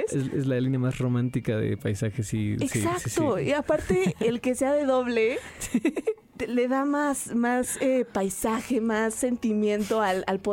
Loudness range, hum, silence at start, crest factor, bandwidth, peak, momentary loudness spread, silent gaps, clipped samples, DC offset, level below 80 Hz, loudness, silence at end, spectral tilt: 1 LU; none; 0 s; 14 dB; 17 kHz; -12 dBFS; 4 LU; none; under 0.1%; under 0.1%; -52 dBFS; -26 LUFS; 0 s; -5.5 dB/octave